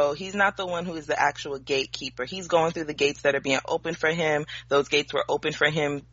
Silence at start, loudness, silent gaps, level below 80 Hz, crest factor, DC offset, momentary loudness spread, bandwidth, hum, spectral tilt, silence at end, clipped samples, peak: 0 s; -25 LUFS; none; -56 dBFS; 18 dB; under 0.1%; 7 LU; 8 kHz; none; -2 dB/octave; 0.1 s; under 0.1%; -8 dBFS